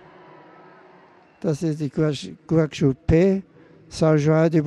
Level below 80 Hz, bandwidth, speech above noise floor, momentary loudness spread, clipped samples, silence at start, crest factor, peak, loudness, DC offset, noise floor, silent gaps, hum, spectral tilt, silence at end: -42 dBFS; 10.5 kHz; 32 dB; 10 LU; under 0.1%; 1.45 s; 14 dB; -8 dBFS; -21 LUFS; under 0.1%; -52 dBFS; none; none; -7.5 dB/octave; 0 s